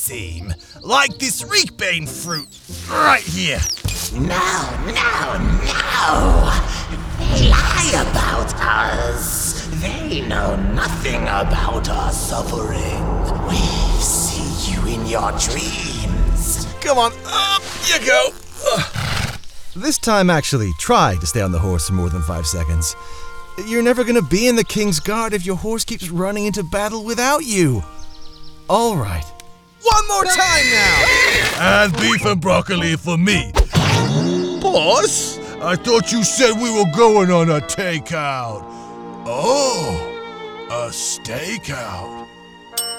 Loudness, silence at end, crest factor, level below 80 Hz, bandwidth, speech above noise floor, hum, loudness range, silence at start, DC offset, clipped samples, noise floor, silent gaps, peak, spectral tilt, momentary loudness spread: -17 LUFS; 0 s; 16 dB; -26 dBFS; over 20 kHz; 24 dB; none; 6 LU; 0 s; under 0.1%; under 0.1%; -41 dBFS; none; -2 dBFS; -3.5 dB/octave; 12 LU